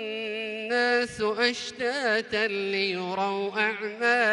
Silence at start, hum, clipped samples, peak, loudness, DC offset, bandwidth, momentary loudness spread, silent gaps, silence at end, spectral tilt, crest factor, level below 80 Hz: 0 s; none; under 0.1%; -10 dBFS; -26 LUFS; under 0.1%; 11.5 kHz; 6 LU; none; 0 s; -3.5 dB/octave; 16 dB; -66 dBFS